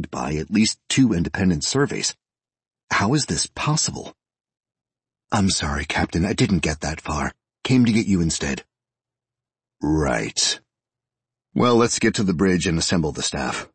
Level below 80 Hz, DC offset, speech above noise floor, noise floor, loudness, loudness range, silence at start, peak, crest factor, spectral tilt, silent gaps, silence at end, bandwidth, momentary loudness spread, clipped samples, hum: -40 dBFS; under 0.1%; 68 dB; -89 dBFS; -21 LUFS; 3 LU; 0 s; -6 dBFS; 16 dB; -4.5 dB/octave; 2.84-2.88 s; 0.1 s; 8.8 kHz; 8 LU; under 0.1%; none